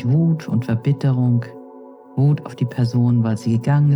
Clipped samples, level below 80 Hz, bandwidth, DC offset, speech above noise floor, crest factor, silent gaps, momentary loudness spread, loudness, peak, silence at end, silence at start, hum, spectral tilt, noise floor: under 0.1%; -56 dBFS; 10.5 kHz; under 0.1%; 23 dB; 12 dB; none; 7 LU; -19 LUFS; -6 dBFS; 0 s; 0 s; none; -9 dB/octave; -41 dBFS